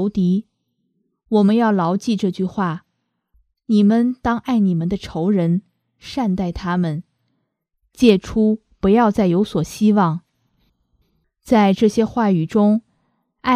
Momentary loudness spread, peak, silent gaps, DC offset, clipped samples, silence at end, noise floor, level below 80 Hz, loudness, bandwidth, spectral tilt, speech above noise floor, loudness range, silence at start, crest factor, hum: 9 LU; 0 dBFS; none; under 0.1%; under 0.1%; 0 s; -72 dBFS; -46 dBFS; -18 LUFS; 11 kHz; -7.5 dB/octave; 55 dB; 3 LU; 0 s; 18 dB; none